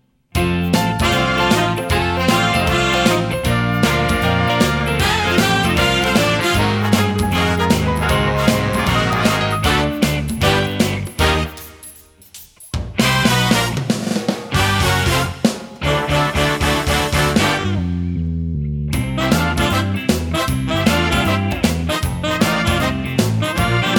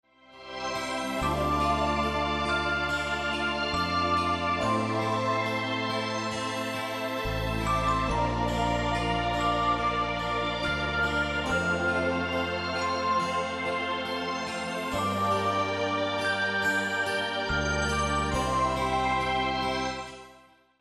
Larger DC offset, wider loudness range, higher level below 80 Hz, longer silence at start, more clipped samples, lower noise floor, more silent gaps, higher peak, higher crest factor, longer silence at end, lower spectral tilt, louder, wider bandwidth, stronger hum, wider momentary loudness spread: neither; about the same, 3 LU vs 2 LU; first, -30 dBFS vs -42 dBFS; about the same, 0.35 s vs 0.3 s; neither; second, -42 dBFS vs -57 dBFS; neither; first, 0 dBFS vs -14 dBFS; about the same, 16 dB vs 14 dB; second, 0 s vs 0.4 s; about the same, -4.5 dB/octave vs -4.5 dB/octave; first, -17 LUFS vs -28 LUFS; first, over 20 kHz vs 14 kHz; neither; about the same, 6 LU vs 5 LU